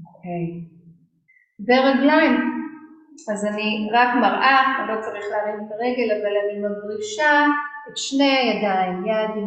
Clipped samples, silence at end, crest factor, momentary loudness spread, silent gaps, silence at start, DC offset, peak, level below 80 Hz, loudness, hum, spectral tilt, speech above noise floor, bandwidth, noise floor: under 0.1%; 0 s; 18 dB; 14 LU; none; 0 s; under 0.1%; -4 dBFS; -68 dBFS; -20 LUFS; none; -4.5 dB/octave; 40 dB; 9 kHz; -60 dBFS